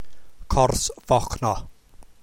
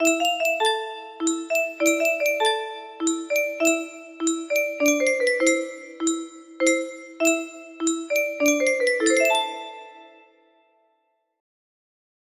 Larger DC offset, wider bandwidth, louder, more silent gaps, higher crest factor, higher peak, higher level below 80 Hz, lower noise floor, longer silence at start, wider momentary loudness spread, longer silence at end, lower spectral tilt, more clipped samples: neither; about the same, 16.5 kHz vs 15.5 kHz; about the same, -23 LUFS vs -22 LUFS; neither; about the same, 20 dB vs 18 dB; about the same, -4 dBFS vs -6 dBFS; first, -34 dBFS vs -74 dBFS; second, -46 dBFS vs -71 dBFS; about the same, 0 s vs 0 s; second, 6 LU vs 12 LU; second, 0.05 s vs 2.3 s; first, -4.5 dB/octave vs 0 dB/octave; neither